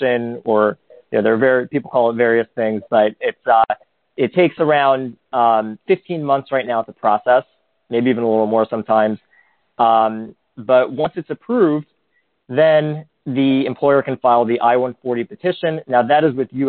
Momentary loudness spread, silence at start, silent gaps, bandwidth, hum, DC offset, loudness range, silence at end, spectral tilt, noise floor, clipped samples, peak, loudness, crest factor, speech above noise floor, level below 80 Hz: 9 LU; 0 s; none; 4.4 kHz; none; under 0.1%; 2 LU; 0 s; -4.5 dB/octave; -66 dBFS; under 0.1%; 0 dBFS; -17 LUFS; 16 dB; 50 dB; -64 dBFS